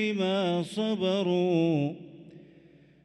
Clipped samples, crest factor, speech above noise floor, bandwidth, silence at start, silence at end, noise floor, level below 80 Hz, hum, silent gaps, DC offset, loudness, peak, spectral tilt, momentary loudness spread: under 0.1%; 14 dB; 30 dB; 11.5 kHz; 0 s; 0.6 s; -56 dBFS; -74 dBFS; none; none; under 0.1%; -27 LUFS; -16 dBFS; -7 dB/octave; 9 LU